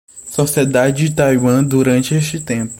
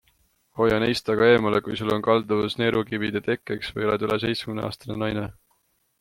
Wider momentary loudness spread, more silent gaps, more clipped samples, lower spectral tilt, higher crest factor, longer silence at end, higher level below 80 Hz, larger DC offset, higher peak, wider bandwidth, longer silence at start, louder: second, 6 LU vs 11 LU; neither; neither; about the same, -5.5 dB/octave vs -6 dB/octave; second, 14 dB vs 20 dB; second, 0 s vs 0.7 s; first, -46 dBFS vs -54 dBFS; neither; first, -2 dBFS vs -6 dBFS; about the same, 16.5 kHz vs 15.5 kHz; second, 0.15 s vs 0.55 s; first, -15 LUFS vs -24 LUFS